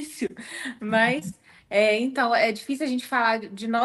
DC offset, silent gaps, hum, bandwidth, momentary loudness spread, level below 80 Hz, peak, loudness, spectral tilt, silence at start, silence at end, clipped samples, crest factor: under 0.1%; none; none; 12.5 kHz; 11 LU; -66 dBFS; -8 dBFS; -24 LUFS; -4 dB/octave; 0 s; 0 s; under 0.1%; 18 dB